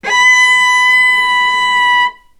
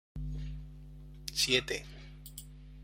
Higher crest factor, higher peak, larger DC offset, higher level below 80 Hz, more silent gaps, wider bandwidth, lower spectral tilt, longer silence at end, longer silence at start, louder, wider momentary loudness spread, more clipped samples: second, 10 dB vs 26 dB; first, 0 dBFS vs -12 dBFS; neither; second, -52 dBFS vs -46 dBFS; neither; about the same, 15 kHz vs 16.5 kHz; second, 2 dB/octave vs -2.5 dB/octave; first, 0.25 s vs 0 s; about the same, 0.05 s vs 0.15 s; first, -8 LUFS vs -33 LUFS; second, 4 LU vs 23 LU; neither